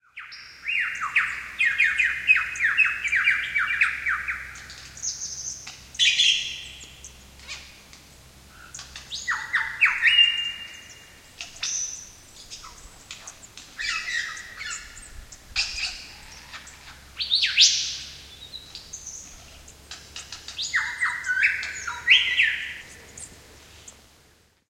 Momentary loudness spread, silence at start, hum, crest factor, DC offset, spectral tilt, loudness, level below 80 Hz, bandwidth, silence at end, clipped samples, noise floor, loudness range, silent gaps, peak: 24 LU; 0.15 s; none; 24 dB; under 0.1%; 2 dB/octave; -22 LUFS; -54 dBFS; 16.5 kHz; 0.8 s; under 0.1%; -59 dBFS; 11 LU; none; -2 dBFS